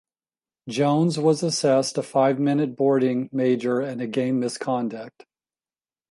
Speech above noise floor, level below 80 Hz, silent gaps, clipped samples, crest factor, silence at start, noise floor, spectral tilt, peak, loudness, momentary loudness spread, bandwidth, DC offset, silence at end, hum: over 68 dB; -72 dBFS; none; under 0.1%; 16 dB; 0.65 s; under -90 dBFS; -5.5 dB/octave; -6 dBFS; -23 LUFS; 8 LU; 11.5 kHz; under 0.1%; 1 s; none